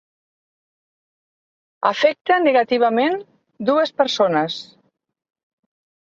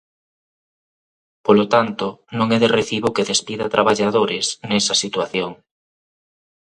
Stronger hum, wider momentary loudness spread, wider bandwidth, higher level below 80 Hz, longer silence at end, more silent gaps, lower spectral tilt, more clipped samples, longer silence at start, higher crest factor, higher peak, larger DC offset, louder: neither; about the same, 9 LU vs 9 LU; second, 7.6 kHz vs 11 kHz; second, -70 dBFS vs -58 dBFS; first, 1.4 s vs 1.1 s; neither; about the same, -4.5 dB/octave vs -3.5 dB/octave; neither; first, 1.8 s vs 1.45 s; about the same, 20 dB vs 20 dB; about the same, -2 dBFS vs 0 dBFS; neither; about the same, -18 LUFS vs -18 LUFS